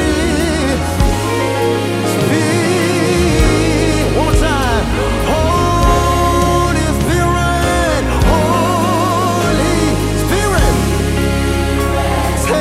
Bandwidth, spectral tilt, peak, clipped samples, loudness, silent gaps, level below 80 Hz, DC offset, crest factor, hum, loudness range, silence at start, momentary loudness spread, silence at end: 16 kHz; -5 dB/octave; 0 dBFS; under 0.1%; -14 LUFS; none; -20 dBFS; under 0.1%; 12 dB; none; 1 LU; 0 s; 3 LU; 0 s